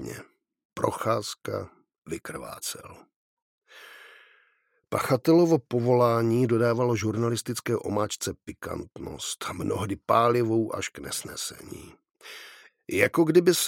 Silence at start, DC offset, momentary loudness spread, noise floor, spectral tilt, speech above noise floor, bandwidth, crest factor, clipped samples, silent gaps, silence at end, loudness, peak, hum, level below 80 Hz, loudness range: 0 s; under 0.1%; 22 LU; -69 dBFS; -5 dB/octave; 43 dB; 17 kHz; 22 dB; under 0.1%; 0.65-0.70 s, 1.98-2.02 s, 3.16-3.62 s; 0 s; -26 LUFS; -6 dBFS; none; -60 dBFS; 11 LU